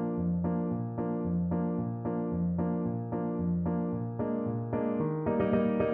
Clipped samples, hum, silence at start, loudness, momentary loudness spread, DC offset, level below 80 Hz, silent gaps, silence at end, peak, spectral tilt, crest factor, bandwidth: under 0.1%; none; 0 s; -32 LUFS; 5 LU; under 0.1%; -54 dBFS; none; 0 s; -16 dBFS; -10 dB/octave; 14 dB; 3.3 kHz